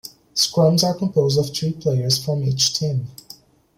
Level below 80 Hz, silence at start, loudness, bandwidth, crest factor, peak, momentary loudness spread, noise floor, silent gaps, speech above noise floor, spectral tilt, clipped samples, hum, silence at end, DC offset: -56 dBFS; 0.05 s; -19 LUFS; 16.5 kHz; 16 dB; -4 dBFS; 8 LU; -46 dBFS; none; 27 dB; -5 dB/octave; under 0.1%; none; 0.65 s; under 0.1%